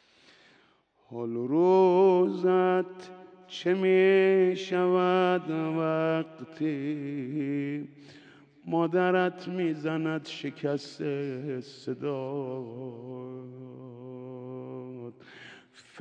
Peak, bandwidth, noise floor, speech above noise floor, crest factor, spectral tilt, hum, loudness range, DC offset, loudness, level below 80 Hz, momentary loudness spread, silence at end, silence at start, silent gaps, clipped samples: -12 dBFS; 7.8 kHz; -65 dBFS; 38 dB; 16 dB; -7.5 dB/octave; none; 13 LU; under 0.1%; -27 LUFS; -86 dBFS; 22 LU; 0 s; 1.1 s; none; under 0.1%